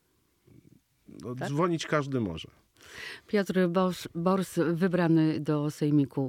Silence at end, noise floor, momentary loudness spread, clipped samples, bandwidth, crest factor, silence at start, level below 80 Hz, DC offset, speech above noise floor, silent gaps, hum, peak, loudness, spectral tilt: 0 s; -67 dBFS; 16 LU; under 0.1%; 16 kHz; 16 dB; 1.15 s; -66 dBFS; under 0.1%; 39 dB; none; none; -14 dBFS; -28 LUFS; -7 dB/octave